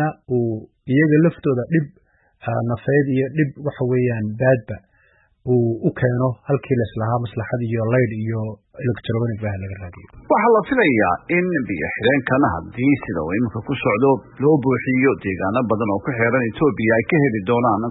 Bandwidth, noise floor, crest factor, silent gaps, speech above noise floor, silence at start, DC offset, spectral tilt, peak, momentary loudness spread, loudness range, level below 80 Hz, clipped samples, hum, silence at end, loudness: 4.1 kHz; -58 dBFS; 16 dB; none; 39 dB; 0 s; under 0.1%; -12.5 dB/octave; -4 dBFS; 9 LU; 4 LU; -50 dBFS; under 0.1%; none; 0 s; -19 LUFS